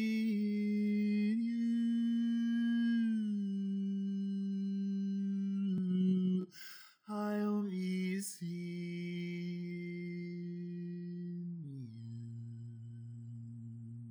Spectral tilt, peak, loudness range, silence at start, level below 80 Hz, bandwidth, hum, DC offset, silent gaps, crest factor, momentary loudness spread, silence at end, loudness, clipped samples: -7 dB/octave; -24 dBFS; 11 LU; 0 s; -90 dBFS; over 20 kHz; none; under 0.1%; none; 12 dB; 16 LU; 0 s; -37 LUFS; under 0.1%